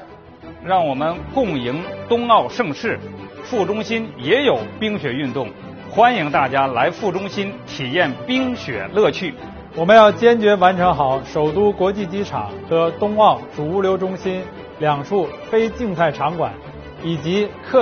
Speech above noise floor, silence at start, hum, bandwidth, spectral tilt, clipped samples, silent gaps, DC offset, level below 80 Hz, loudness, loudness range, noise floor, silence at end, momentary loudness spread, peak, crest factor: 21 dB; 0 s; none; 6.6 kHz; -4 dB/octave; under 0.1%; none; under 0.1%; -48 dBFS; -18 LUFS; 6 LU; -39 dBFS; 0 s; 13 LU; 0 dBFS; 18 dB